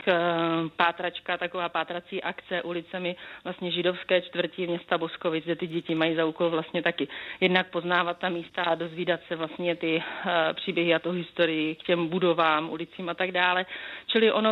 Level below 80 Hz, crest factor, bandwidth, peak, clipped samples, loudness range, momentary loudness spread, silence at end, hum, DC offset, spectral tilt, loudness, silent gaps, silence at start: -72 dBFS; 22 dB; 5.6 kHz; -6 dBFS; under 0.1%; 4 LU; 9 LU; 0 s; none; under 0.1%; -7.5 dB/octave; -27 LUFS; none; 0 s